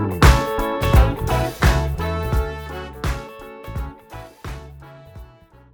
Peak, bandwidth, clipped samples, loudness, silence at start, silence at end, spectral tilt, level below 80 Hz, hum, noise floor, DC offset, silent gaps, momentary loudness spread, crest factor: -2 dBFS; over 20 kHz; under 0.1%; -20 LUFS; 0 s; 0.5 s; -6 dB/octave; -24 dBFS; none; -47 dBFS; under 0.1%; none; 23 LU; 18 dB